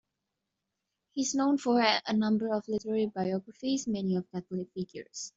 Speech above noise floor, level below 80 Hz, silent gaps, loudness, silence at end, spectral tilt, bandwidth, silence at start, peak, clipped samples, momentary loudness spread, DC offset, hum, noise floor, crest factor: 55 dB; -72 dBFS; none; -31 LUFS; 0.1 s; -4.5 dB/octave; 8 kHz; 1.15 s; -12 dBFS; under 0.1%; 13 LU; under 0.1%; none; -85 dBFS; 20 dB